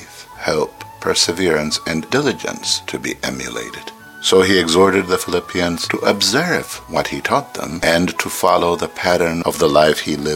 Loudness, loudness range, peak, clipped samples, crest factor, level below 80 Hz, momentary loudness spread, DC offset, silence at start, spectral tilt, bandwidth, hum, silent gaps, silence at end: -17 LUFS; 3 LU; 0 dBFS; under 0.1%; 18 dB; -46 dBFS; 12 LU; under 0.1%; 0 s; -3.5 dB/octave; 17 kHz; none; none; 0 s